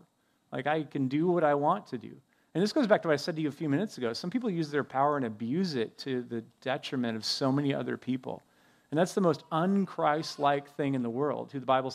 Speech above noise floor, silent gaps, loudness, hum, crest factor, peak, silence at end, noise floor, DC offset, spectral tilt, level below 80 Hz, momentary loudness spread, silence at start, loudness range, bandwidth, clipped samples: 40 dB; none; -30 LUFS; none; 22 dB; -8 dBFS; 0 s; -69 dBFS; under 0.1%; -6 dB/octave; -80 dBFS; 9 LU; 0.5 s; 3 LU; 14 kHz; under 0.1%